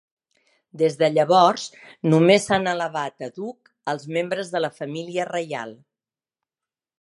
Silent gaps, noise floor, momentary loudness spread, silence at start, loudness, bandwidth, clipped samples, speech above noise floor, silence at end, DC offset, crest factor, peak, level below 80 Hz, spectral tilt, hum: none; under -90 dBFS; 16 LU; 0.75 s; -22 LUFS; 11.5 kHz; under 0.1%; over 68 dB; 1.25 s; under 0.1%; 22 dB; 0 dBFS; -66 dBFS; -5.5 dB/octave; none